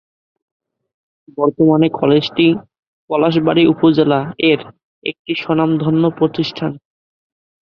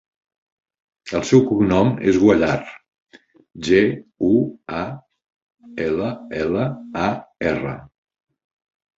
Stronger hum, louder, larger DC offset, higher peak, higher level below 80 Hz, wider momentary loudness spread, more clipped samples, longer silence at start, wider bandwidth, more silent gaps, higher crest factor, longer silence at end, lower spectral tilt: neither; first, -15 LUFS vs -20 LUFS; neither; about the same, -2 dBFS vs -2 dBFS; second, -56 dBFS vs -48 dBFS; second, 12 LU vs 15 LU; neither; first, 1.4 s vs 1.05 s; second, 6.2 kHz vs 7.8 kHz; first, 2.79-3.08 s, 4.84-5.02 s, 5.19-5.25 s vs 3.02-3.06 s, 5.36-5.47 s; second, 14 dB vs 20 dB; second, 0.95 s vs 1.15 s; first, -8.5 dB/octave vs -6.5 dB/octave